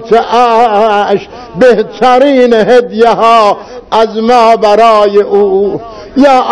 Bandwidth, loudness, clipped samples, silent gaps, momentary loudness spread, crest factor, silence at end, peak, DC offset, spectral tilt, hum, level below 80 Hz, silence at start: 11 kHz; -7 LUFS; 8%; none; 8 LU; 6 dB; 0 s; 0 dBFS; 1%; -5 dB/octave; none; -42 dBFS; 0 s